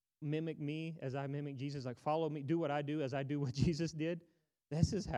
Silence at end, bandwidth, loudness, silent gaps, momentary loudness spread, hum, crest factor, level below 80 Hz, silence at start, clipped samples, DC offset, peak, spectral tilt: 0 s; 10.5 kHz; -39 LUFS; none; 7 LU; none; 20 dB; -60 dBFS; 0.2 s; under 0.1%; under 0.1%; -18 dBFS; -7 dB/octave